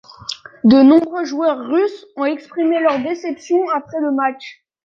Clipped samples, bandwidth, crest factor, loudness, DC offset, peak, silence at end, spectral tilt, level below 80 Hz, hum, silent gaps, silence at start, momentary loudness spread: under 0.1%; 7.4 kHz; 14 dB; -16 LUFS; under 0.1%; -2 dBFS; 0.35 s; -6 dB/octave; -58 dBFS; none; none; 0.3 s; 17 LU